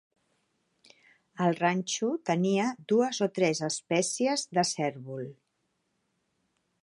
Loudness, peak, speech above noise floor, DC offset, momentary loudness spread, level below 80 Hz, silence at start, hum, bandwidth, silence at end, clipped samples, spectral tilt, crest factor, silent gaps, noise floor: -28 LUFS; -12 dBFS; 49 dB; under 0.1%; 7 LU; -80 dBFS; 1.35 s; none; 11.5 kHz; 1.5 s; under 0.1%; -4.5 dB/octave; 18 dB; none; -78 dBFS